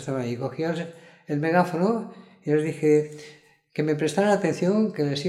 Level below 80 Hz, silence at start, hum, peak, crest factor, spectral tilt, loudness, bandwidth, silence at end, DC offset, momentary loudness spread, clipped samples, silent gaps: -72 dBFS; 0 s; none; -6 dBFS; 18 dB; -6.5 dB/octave; -24 LUFS; 13 kHz; 0 s; under 0.1%; 14 LU; under 0.1%; none